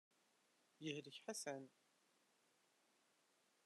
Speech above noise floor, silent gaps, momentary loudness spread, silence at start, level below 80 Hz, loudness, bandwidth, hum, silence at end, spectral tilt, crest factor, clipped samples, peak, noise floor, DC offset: 29 dB; none; 6 LU; 0.8 s; under -90 dBFS; -51 LUFS; 12.5 kHz; none; 1.95 s; -3 dB/octave; 24 dB; under 0.1%; -34 dBFS; -81 dBFS; under 0.1%